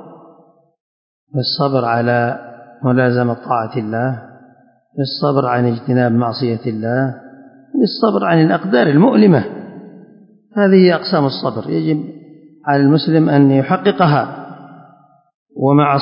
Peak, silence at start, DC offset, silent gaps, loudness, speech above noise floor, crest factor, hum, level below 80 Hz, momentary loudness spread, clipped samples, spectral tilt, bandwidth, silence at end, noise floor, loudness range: 0 dBFS; 0 s; under 0.1%; 0.80-1.27 s, 15.34-15.46 s; -15 LUFS; 36 dB; 14 dB; none; -62 dBFS; 14 LU; under 0.1%; -12 dB/octave; 5.4 kHz; 0 s; -50 dBFS; 4 LU